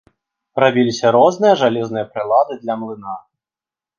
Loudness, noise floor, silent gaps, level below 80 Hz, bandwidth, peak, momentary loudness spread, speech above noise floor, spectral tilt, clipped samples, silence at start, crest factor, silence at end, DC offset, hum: -16 LUFS; under -90 dBFS; none; -64 dBFS; 7.4 kHz; 0 dBFS; 15 LU; over 74 dB; -5.5 dB/octave; under 0.1%; 0.55 s; 16 dB; 0.8 s; under 0.1%; none